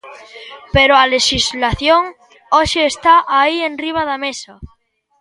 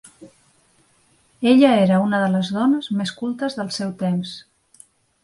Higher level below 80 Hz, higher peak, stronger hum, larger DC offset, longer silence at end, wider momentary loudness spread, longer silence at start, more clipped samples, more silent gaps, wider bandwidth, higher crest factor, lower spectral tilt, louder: first, -36 dBFS vs -64 dBFS; about the same, 0 dBFS vs -2 dBFS; neither; neither; second, 0.55 s vs 0.85 s; first, 15 LU vs 12 LU; second, 0.05 s vs 0.2 s; neither; neither; about the same, 11.5 kHz vs 11.5 kHz; about the same, 16 dB vs 18 dB; second, -3 dB/octave vs -6.5 dB/octave; first, -13 LUFS vs -19 LUFS